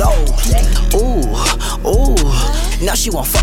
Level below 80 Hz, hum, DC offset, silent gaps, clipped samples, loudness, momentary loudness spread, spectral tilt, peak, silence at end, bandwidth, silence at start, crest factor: -14 dBFS; none; under 0.1%; none; under 0.1%; -15 LUFS; 3 LU; -4 dB/octave; -2 dBFS; 0 s; 17 kHz; 0 s; 10 dB